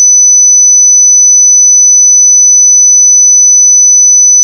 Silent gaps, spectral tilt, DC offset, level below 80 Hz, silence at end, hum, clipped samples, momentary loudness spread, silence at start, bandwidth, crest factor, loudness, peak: none; 12.5 dB/octave; under 0.1%; under -90 dBFS; 0 s; none; under 0.1%; 0 LU; 0 s; 6.4 kHz; 2 dB; 0 LUFS; 0 dBFS